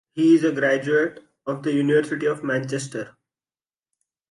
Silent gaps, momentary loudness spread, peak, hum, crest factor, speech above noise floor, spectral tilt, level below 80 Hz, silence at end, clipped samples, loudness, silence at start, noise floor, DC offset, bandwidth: none; 14 LU; -6 dBFS; none; 16 dB; over 69 dB; -6 dB/octave; -72 dBFS; 1.2 s; under 0.1%; -22 LUFS; 0.15 s; under -90 dBFS; under 0.1%; 11.5 kHz